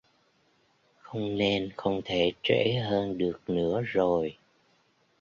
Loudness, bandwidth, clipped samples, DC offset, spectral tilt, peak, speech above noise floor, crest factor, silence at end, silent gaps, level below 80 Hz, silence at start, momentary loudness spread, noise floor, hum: -28 LUFS; 7.2 kHz; under 0.1%; under 0.1%; -6.5 dB/octave; -10 dBFS; 40 dB; 20 dB; 0.9 s; none; -58 dBFS; 1.05 s; 7 LU; -68 dBFS; none